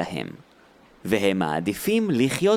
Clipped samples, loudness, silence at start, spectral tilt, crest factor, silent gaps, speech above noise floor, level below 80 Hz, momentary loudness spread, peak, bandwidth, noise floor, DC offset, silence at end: under 0.1%; -24 LUFS; 0 s; -5.5 dB/octave; 16 dB; none; 31 dB; -58 dBFS; 13 LU; -8 dBFS; 19 kHz; -54 dBFS; under 0.1%; 0 s